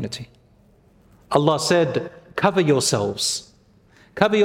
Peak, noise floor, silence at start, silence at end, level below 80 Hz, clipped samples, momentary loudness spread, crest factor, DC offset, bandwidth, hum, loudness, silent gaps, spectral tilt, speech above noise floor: -2 dBFS; -55 dBFS; 0 s; 0 s; -58 dBFS; under 0.1%; 13 LU; 20 dB; under 0.1%; 16.5 kHz; none; -21 LUFS; none; -4 dB/octave; 35 dB